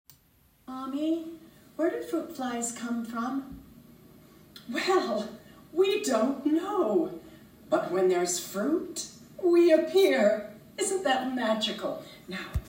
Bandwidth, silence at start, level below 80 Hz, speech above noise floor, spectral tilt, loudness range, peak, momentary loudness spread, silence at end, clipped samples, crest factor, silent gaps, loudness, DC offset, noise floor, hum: 16 kHz; 0.7 s; -54 dBFS; 36 dB; -4 dB/octave; 8 LU; -10 dBFS; 17 LU; 0 s; under 0.1%; 18 dB; none; -28 LUFS; under 0.1%; -63 dBFS; none